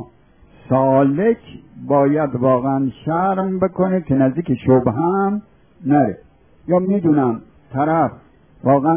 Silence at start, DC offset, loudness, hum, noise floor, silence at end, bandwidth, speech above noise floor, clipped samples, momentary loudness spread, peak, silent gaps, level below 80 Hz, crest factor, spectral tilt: 0 s; 0.1%; -18 LUFS; none; -50 dBFS; 0 s; 3.6 kHz; 33 dB; under 0.1%; 9 LU; -2 dBFS; none; -50 dBFS; 16 dB; -13 dB/octave